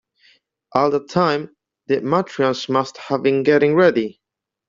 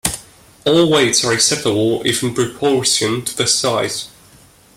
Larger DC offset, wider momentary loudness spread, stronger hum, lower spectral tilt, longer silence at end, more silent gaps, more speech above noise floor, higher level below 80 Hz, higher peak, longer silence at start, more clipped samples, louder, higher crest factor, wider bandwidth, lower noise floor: neither; about the same, 9 LU vs 10 LU; neither; first, -6.5 dB/octave vs -3 dB/octave; second, 0.55 s vs 0.7 s; neither; first, 40 dB vs 31 dB; second, -62 dBFS vs -48 dBFS; about the same, 0 dBFS vs 0 dBFS; first, 0.75 s vs 0.05 s; neither; second, -18 LUFS vs -15 LUFS; about the same, 18 dB vs 18 dB; second, 7.6 kHz vs 16.5 kHz; first, -57 dBFS vs -47 dBFS